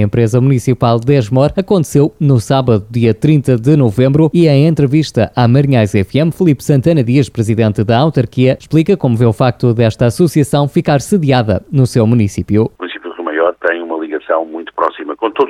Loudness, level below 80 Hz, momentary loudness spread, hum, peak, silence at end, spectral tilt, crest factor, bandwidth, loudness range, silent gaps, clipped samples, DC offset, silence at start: -12 LUFS; -42 dBFS; 7 LU; none; 0 dBFS; 0 s; -7.5 dB/octave; 10 dB; 14.5 kHz; 3 LU; none; under 0.1%; under 0.1%; 0 s